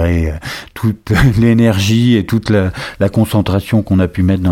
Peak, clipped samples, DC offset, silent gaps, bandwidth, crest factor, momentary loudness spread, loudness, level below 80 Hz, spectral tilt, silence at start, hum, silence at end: 0 dBFS; under 0.1%; under 0.1%; none; 16.5 kHz; 12 dB; 8 LU; -13 LUFS; -28 dBFS; -7 dB/octave; 0 s; none; 0 s